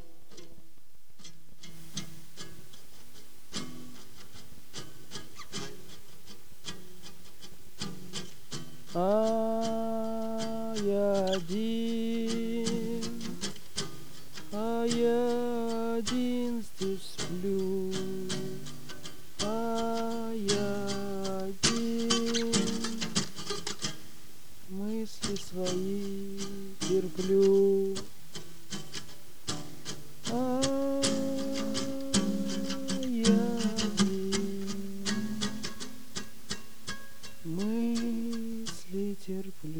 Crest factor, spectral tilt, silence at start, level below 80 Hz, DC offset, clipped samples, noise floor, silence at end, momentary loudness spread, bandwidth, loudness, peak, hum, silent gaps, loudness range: 22 dB; -4.5 dB/octave; 0.3 s; -60 dBFS; 2%; under 0.1%; -63 dBFS; 0 s; 22 LU; over 20 kHz; -32 LUFS; -10 dBFS; none; none; 15 LU